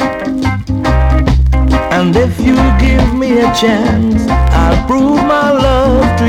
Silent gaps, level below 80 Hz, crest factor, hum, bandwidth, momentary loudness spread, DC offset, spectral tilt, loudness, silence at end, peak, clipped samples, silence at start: none; -14 dBFS; 6 dB; none; 12 kHz; 4 LU; under 0.1%; -7 dB/octave; -11 LUFS; 0 s; -2 dBFS; under 0.1%; 0 s